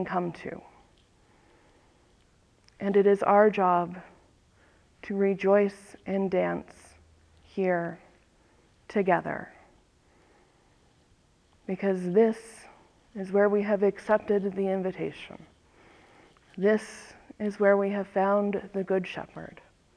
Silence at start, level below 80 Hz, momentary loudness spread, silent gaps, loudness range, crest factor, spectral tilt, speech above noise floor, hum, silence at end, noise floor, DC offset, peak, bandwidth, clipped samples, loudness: 0 s; -66 dBFS; 22 LU; none; 6 LU; 20 dB; -7.5 dB/octave; 37 dB; none; 0.45 s; -64 dBFS; under 0.1%; -8 dBFS; 10.5 kHz; under 0.1%; -27 LUFS